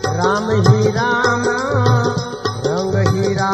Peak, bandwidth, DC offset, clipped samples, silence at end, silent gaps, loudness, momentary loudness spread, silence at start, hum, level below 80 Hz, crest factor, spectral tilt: 0 dBFS; 9 kHz; under 0.1%; under 0.1%; 0 s; none; -16 LUFS; 6 LU; 0 s; none; -44 dBFS; 16 dB; -6 dB/octave